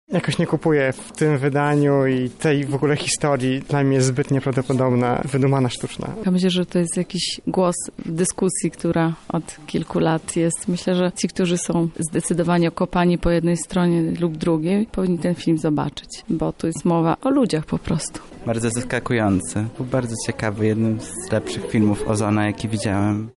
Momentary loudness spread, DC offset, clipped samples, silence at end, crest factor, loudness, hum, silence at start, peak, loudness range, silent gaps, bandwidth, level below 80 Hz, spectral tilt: 6 LU; under 0.1%; under 0.1%; 0.05 s; 12 dB; -21 LUFS; none; 0.1 s; -8 dBFS; 3 LU; none; 11.5 kHz; -44 dBFS; -5.5 dB/octave